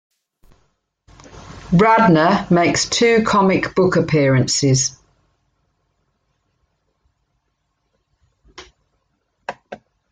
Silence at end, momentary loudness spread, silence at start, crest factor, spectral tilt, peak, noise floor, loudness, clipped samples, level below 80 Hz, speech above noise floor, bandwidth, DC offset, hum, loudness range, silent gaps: 0.35 s; 21 LU; 1.35 s; 18 dB; -5 dB/octave; -2 dBFS; -70 dBFS; -15 LUFS; under 0.1%; -48 dBFS; 56 dB; 9.6 kHz; under 0.1%; none; 8 LU; none